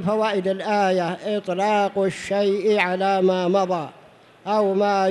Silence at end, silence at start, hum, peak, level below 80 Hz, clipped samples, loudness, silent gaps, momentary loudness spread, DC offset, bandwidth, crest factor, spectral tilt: 0 s; 0 s; none; -6 dBFS; -66 dBFS; under 0.1%; -21 LUFS; none; 6 LU; under 0.1%; 11.5 kHz; 16 dB; -6 dB/octave